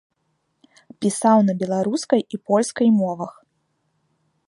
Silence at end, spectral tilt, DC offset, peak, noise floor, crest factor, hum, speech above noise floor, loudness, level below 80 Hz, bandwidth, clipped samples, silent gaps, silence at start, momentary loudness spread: 1.2 s; -6 dB/octave; under 0.1%; -4 dBFS; -71 dBFS; 18 dB; none; 52 dB; -20 LUFS; -70 dBFS; 11.5 kHz; under 0.1%; none; 1 s; 9 LU